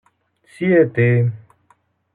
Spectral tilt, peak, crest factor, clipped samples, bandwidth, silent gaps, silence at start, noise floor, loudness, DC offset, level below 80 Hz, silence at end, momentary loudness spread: -10 dB/octave; -4 dBFS; 16 dB; under 0.1%; 4.2 kHz; none; 0.6 s; -60 dBFS; -17 LUFS; under 0.1%; -64 dBFS; 0.75 s; 9 LU